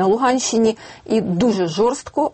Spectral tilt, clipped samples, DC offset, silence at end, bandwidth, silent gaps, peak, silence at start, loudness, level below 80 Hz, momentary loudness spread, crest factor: -5 dB/octave; under 0.1%; under 0.1%; 0.05 s; 8.8 kHz; none; -6 dBFS; 0 s; -18 LUFS; -52 dBFS; 5 LU; 12 dB